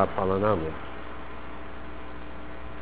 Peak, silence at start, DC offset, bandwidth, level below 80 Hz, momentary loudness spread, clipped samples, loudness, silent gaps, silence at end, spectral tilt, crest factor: -6 dBFS; 0 s; 2%; 4 kHz; -44 dBFS; 16 LU; under 0.1%; -32 LUFS; none; 0 s; -10.5 dB/octave; 24 dB